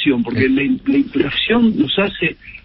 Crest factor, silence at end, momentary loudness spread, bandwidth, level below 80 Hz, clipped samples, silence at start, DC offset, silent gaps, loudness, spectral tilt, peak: 14 dB; 0.05 s; 4 LU; 5.6 kHz; -44 dBFS; under 0.1%; 0 s; under 0.1%; none; -16 LUFS; -11 dB/octave; -2 dBFS